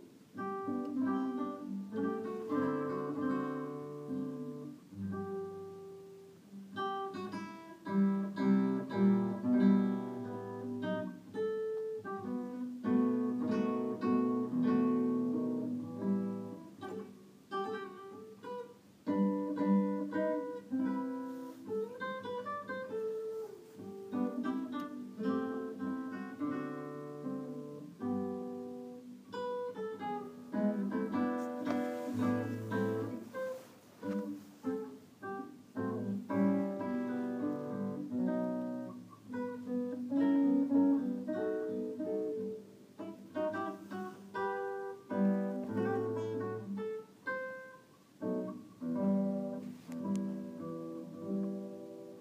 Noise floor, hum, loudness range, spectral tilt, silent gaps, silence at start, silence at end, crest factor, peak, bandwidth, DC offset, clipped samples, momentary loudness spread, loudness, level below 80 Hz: -59 dBFS; none; 8 LU; -8.5 dB/octave; none; 0 s; 0 s; 18 dB; -18 dBFS; 15 kHz; under 0.1%; under 0.1%; 14 LU; -37 LUFS; -84 dBFS